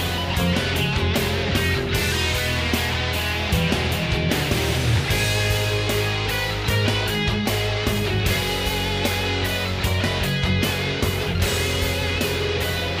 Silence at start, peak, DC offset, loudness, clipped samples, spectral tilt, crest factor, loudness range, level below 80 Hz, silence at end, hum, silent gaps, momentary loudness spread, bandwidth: 0 s; -8 dBFS; under 0.1%; -22 LUFS; under 0.1%; -4.5 dB/octave; 14 dB; 1 LU; -34 dBFS; 0 s; none; none; 2 LU; 16 kHz